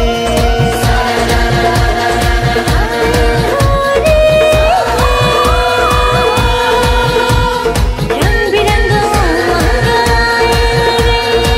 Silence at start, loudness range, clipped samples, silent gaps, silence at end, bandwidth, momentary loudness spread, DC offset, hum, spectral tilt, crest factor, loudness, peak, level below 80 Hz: 0 s; 2 LU; under 0.1%; none; 0 s; 16.5 kHz; 3 LU; under 0.1%; none; -4.5 dB/octave; 10 dB; -11 LUFS; 0 dBFS; -16 dBFS